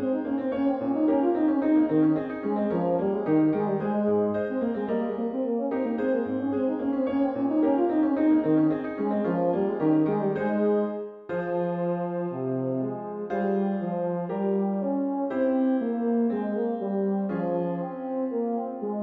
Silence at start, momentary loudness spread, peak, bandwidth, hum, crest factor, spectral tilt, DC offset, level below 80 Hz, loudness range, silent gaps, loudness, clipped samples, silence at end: 0 s; 6 LU; -12 dBFS; 4.2 kHz; none; 14 dB; -11 dB/octave; under 0.1%; -66 dBFS; 4 LU; none; -26 LUFS; under 0.1%; 0 s